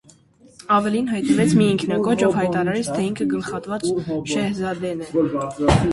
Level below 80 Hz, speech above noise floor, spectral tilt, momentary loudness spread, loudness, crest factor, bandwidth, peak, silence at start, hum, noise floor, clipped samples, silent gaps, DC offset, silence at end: -40 dBFS; 31 dB; -6 dB/octave; 8 LU; -21 LUFS; 18 dB; 11.5 kHz; -2 dBFS; 0.7 s; none; -51 dBFS; under 0.1%; none; under 0.1%; 0 s